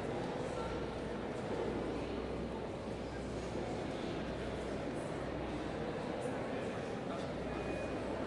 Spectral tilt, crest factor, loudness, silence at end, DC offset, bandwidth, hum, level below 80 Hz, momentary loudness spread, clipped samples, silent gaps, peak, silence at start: -6.5 dB/octave; 14 dB; -41 LUFS; 0 s; under 0.1%; 11.5 kHz; none; -54 dBFS; 2 LU; under 0.1%; none; -26 dBFS; 0 s